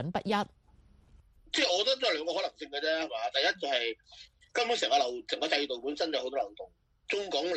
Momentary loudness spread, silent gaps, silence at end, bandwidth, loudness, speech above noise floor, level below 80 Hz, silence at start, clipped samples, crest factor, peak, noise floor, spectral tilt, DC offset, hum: 9 LU; none; 0 s; 11.5 kHz; -31 LUFS; 30 dB; -66 dBFS; 0 s; under 0.1%; 20 dB; -12 dBFS; -61 dBFS; -3 dB/octave; under 0.1%; none